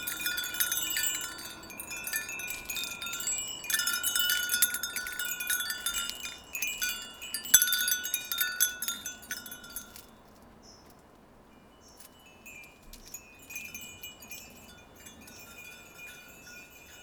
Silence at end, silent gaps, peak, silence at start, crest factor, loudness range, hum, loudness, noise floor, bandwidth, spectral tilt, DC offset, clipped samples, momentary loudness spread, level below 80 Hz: 0 s; none; -4 dBFS; 0 s; 32 dB; 18 LU; none; -30 LUFS; -57 dBFS; over 20 kHz; 1.5 dB/octave; under 0.1%; under 0.1%; 22 LU; -62 dBFS